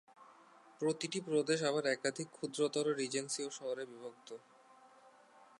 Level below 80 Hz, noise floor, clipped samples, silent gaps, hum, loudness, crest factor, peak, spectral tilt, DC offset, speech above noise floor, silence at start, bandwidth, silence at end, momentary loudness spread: -90 dBFS; -63 dBFS; under 0.1%; none; none; -37 LUFS; 20 dB; -20 dBFS; -3.5 dB/octave; under 0.1%; 26 dB; 0.2 s; 11.5 kHz; 0.15 s; 16 LU